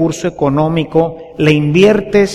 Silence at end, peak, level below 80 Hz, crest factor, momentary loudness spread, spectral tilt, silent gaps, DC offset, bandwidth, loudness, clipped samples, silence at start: 0 s; 0 dBFS; -38 dBFS; 12 dB; 7 LU; -6.5 dB/octave; none; under 0.1%; 12.5 kHz; -12 LUFS; under 0.1%; 0 s